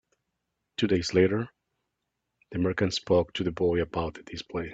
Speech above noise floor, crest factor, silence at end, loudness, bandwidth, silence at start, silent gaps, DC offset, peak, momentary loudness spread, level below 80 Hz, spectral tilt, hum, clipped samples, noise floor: 55 dB; 20 dB; 0 s; -27 LUFS; 8 kHz; 0.8 s; none; under 0.1%; -8 dBFS; 13 LU; -54 dBFS; -6 dB/octave; none; under 0.1%; -82 dBFS